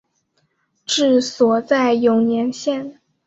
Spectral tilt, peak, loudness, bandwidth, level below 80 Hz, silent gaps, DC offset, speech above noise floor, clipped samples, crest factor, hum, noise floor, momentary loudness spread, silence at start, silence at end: -4 dB/octave; -2 dBFS; -17 LUFS; 8.2 kHz; -64 dBFS; none; under 0.1%; 50 dB; under 0.1%; 16 dB; none; -67 dBFS; 11 LU; 0.9 s; 0.35 s